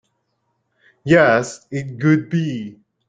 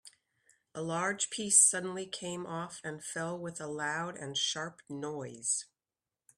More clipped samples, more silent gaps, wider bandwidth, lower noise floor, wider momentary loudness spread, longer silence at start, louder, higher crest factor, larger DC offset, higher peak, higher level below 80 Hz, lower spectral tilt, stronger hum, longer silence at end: neither; neither; second, 9.2 kHz vs 15.5 kHz; second, -70 dBFS vs under -90 dBFS; about the same, 17 LU vs 17 LU; first, 1.05 s vs 0.05 s; first, -18 LUFS vs -32 LUFS; second, 18 dB vs 26 dB; neither; first, -2 dBFS vs -8 dBFS; first, -56 dBFS vs -78 dBFS; first, -6.5 dB/octave vs -1.5 dB/octave; neither; second, 0.35 s vs 0.75 s